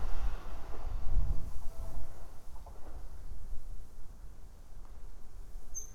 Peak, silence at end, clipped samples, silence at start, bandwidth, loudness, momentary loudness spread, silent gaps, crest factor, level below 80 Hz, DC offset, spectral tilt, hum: -16 dBFS; 0 s; under 0.1%; 0 s; 6.8 kHz; -46 LUFS; 16 LU; none; 14 dB; -38 dBFS; under 0.1%; -5 dB/octave; none